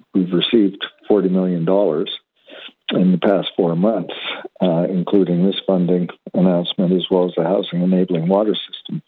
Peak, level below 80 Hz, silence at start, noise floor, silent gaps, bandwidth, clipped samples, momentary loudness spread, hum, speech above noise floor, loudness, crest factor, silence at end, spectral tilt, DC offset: -4 dBFS; -66 dBFS; 0.15 s; -40 dBFS; none; 4.3 kHz; under 0.1%; 10 LU; none; 23 dB; -18 LUFS; 14 dB; 0.1 s; -10.5 dB/octave; under 0.1%